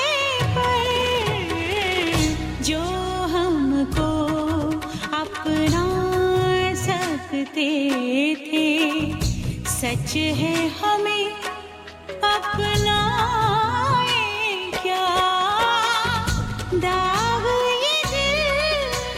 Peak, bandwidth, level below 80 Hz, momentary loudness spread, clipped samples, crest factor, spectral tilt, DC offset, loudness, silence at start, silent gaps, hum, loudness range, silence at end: -6 dBFS; 16.5 kHz; -38 dBFS; 6 LU; under 0.1%; 14 dB; -4.5 dB/octave; under 0.1%; -21 LUFS; 0 s; none; none; 3 LU; 0 s